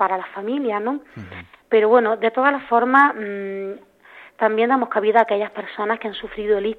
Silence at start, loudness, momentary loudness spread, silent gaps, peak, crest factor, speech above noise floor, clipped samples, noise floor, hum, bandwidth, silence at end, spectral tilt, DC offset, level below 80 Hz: 0 s; -19 LUFS; 15 LU; none; -2 dBFS; 18 dB; 27 dB; under 0.1%; -46 dBFS; none; 4.6 kHz; 0.05 s; -7 dB/octave; under 0.1%; -58 dBFS